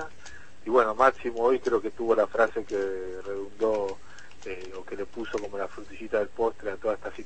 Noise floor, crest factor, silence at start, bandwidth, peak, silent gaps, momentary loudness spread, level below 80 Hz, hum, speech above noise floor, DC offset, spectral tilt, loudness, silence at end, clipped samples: -49 dBFS; 22 dB; 0 s; 8.8 kHz; -6 dBFS; none; 17 LU; -56 dBFS; none; 22 dB; 1%; -5 dB/octave; -28 LUFS; 0 s; under 0.1%